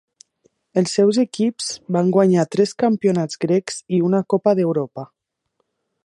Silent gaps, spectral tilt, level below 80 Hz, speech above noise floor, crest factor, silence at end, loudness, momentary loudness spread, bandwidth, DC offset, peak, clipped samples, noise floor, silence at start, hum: none; -6 dB/octave; -68 dBFS; 54 dB; 18 dB; 1 s; -19 LUFS; 8 LU; 11.5 kHz; under 0.1%; -2 dBFS; under 0.1%; -72 dBFS; 0.75 s; none